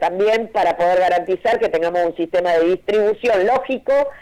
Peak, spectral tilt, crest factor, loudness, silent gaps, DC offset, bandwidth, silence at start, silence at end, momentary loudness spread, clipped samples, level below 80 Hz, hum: -10 dBFS; -5 dB/octave; 6 dB; -18 LUFS; none; under 0.1%; 12 kHz; 0 s; 0 s; 3 LU; under 0.1%; -52 dBFS; none